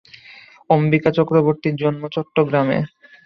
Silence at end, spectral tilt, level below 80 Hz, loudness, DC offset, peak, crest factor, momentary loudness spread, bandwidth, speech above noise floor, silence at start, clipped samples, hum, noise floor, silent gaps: 0.4 s; -9.5 dB/octave; -58 dBFS; -18 LUFS; under 0.1%; -2 dBFS; 18 dB; 7 LU; 6 kHz; 27 dB; 0.7 s; under 0.1%; none; -45 dBFS; none